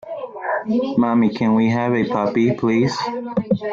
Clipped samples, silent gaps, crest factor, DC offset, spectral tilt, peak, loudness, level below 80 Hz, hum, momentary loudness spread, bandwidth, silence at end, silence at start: under 0.1%; none; 12 dB; under 0.1%; -7 dB/octave; -6 dBFS; -19 LUFS; -56 dBFS; none; 7 LU; 7.4 kHz; 0 s; 0.05 s